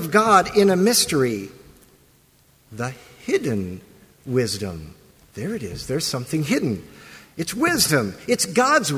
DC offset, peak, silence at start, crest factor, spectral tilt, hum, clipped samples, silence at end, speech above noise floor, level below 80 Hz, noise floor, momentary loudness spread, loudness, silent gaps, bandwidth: under 0.1%; -2 dBFS; 0 s; 22 dB; -4 dB/octave; none; under 0.1%; 0 s; 36 dB; -50 dBFS; -57 dBFS; 19 LU; -21 LUFS; none; 16 kHz